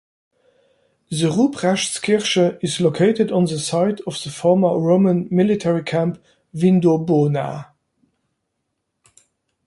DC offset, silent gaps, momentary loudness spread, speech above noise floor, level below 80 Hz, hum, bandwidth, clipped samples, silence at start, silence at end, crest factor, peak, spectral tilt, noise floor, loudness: under 0.1%; none; 9 LU; 57 dB; -60 dBFS; none; 11.5 kHz; under 0.1%; 1.1 s; 2.05 s; 16 dB; -4 dBFS; -6 dB/octave; -75 dBFS; -18 LUFS